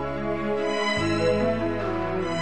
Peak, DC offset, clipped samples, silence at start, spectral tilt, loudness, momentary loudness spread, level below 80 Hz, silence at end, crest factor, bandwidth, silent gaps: -10 dBFS; 1%; under 0.1%; 0 s; -5.5 dB/octave; -25 LUFS; 4 LU; -46 dBFS; 0 s; 14 dB; 9.8 kHz; none